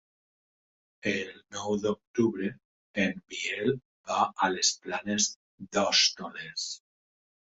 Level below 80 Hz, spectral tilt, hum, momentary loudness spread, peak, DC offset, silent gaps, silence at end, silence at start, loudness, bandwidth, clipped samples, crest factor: -68 dBFS; -2.5 dB/octave; none; 12 LU; -10 dBFS; under 0.1%; 2.07-2.14 s, 2.65-2.94 s, 3.85-4.04 s, 5.36-5.58 s; 0.8 s; 1.05 s; -29 LUFS; 8.4 kHz; under 0.1%; 22 dB